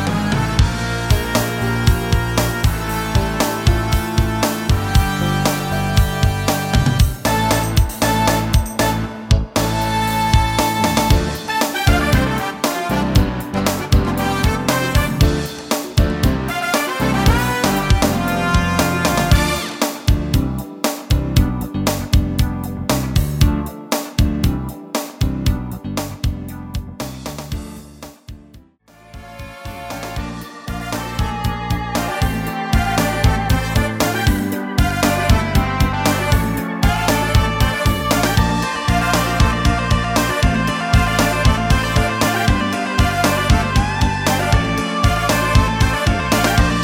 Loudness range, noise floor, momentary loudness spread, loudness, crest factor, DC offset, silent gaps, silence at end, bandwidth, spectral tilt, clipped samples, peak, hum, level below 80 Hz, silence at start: 8 LU; -47 dBFS; 9 LU; -18 LUFS; 16 dB; under 0.1%; none; 0 s; 17 kHz; -5 dB/octave; under 0.1%; -2 dBFS; none; -22 dBFS; 0 s